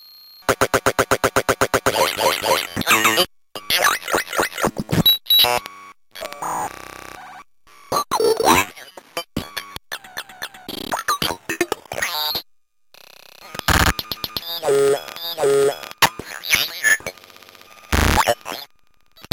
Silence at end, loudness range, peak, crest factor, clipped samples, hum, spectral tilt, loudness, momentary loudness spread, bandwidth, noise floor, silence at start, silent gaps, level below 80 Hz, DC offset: 0.65 s; 7 LU; 0 dBFS; 20 dB; under 0.1%; none; -2.5 dB/octave; -19 LUFS; 17 LU; 17 kHz; -61 dBFS; 0.5 s; none; -38 dBFS; under 0.1%